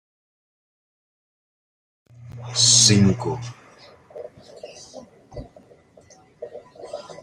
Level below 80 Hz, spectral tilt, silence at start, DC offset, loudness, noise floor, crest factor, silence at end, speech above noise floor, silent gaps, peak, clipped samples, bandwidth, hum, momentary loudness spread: -56 dBFS; -3 dB/octave; 2.2 s; under 0.1%; -16 LUFS; -52 dBFS; 24 dB; 0.05 s; 35 dB; none; -2 dBFS; under 0.1%; 16 kHz; none; 29 LU